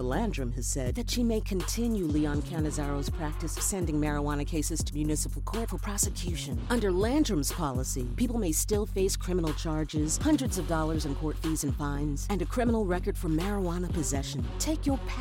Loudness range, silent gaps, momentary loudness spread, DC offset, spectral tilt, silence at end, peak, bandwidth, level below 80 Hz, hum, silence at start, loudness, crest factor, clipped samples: 2 LU; none; 6 LU; under 0.1%; -5 dB/octave; 0 s; -14 dBFS; 17 kHz; -34 dBFS; none; 0 s; -30 LUFS; 16 dB; under 0.1%